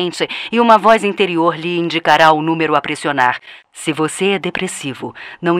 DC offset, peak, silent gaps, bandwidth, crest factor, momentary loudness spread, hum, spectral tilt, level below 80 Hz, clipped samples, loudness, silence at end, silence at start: under 0.1%; 0 dBFS; none; 15 kHz; 16 dB; 14 LU; none; -4.5 dB/octave; -58 dBFS; 0.4%; -15 LUFS; 0 s; 0 s